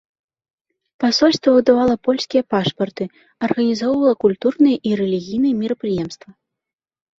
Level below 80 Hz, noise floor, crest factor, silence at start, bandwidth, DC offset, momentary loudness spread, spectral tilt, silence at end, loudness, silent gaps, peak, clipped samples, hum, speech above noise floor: -56 dBFS; -86 dBFS; 18 dB; 1 s; 7.6 kHz; under 0.1%; 10 LU; -5.5 dB/octave; 0.85 s; -18 LUFS; none; 0 dBFS; under 0.1%; none; 69 dB